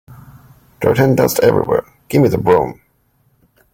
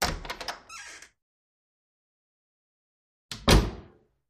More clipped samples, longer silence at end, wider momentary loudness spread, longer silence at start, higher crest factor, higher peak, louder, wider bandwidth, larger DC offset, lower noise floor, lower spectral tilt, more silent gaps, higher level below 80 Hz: neither; first, 1 s vs 0.5 s; second, 7 LU vs 23 LU; about the same, 0.1 s vs 0 s; second, 16 dB vs 26 dB; first, 0 dBFS vs -4 dBFS; first, -14 LUFS vs -27 LUFS; first, 17 kHz vs 15 kHz; neither; first, -59 dBFS vs -54 dBFS; first, -6.5 dB/octave vs -4 dB/octave; second, none vs 1.22-3.29 s; second, -46 dBFS vs -36 dBFS